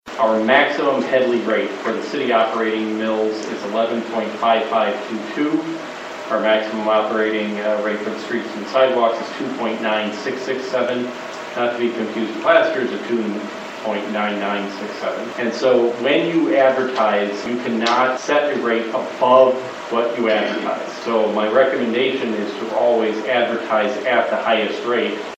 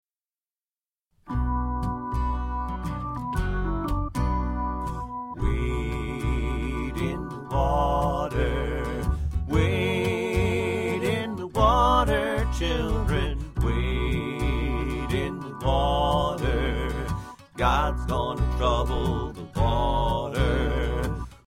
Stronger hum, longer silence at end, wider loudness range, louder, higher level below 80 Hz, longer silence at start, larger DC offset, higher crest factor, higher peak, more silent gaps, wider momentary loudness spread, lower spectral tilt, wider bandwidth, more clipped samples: neither; about the same, 0 s vs 0.1 s; about the same, 3 LU vs 5 LU; first, -19 LUFS vs -26 LUFS; second, -68 dBFS vs -30 dBFS; second, 0.05 s vs 1.25 s; neither; about the same, 18 dB vs 18 dB; first, 0 dBFS vs -8 dBFS; neither; about the same, 9 LU vs 7 LU; second, -4.5 dB/octave vs -6.5 dB/octave; second, 8.6 kHz vs 14 kHz; neither